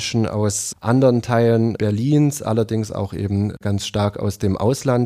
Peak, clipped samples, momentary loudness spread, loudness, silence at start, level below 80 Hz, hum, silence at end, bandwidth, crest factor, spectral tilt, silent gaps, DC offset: -4 dBFS; under 0.1%; 7 LU; -19 LUFS; 0 s; -50 dBFS; none; 0 s; 15.5 kHz; 16 dB; -6 dB/octave; none; under 0.1%